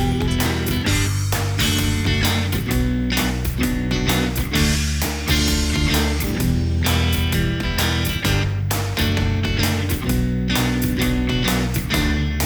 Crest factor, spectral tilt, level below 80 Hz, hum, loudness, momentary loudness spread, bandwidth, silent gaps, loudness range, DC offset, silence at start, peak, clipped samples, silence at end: 14 dB; -4.5 dB/octave; -26 dBFS; none; -20 LUFS; 3 LU; over 20 kHz; none; 1 LU; under 0.1%; 0 s; -4 dBFS; under 0.1%; 0 s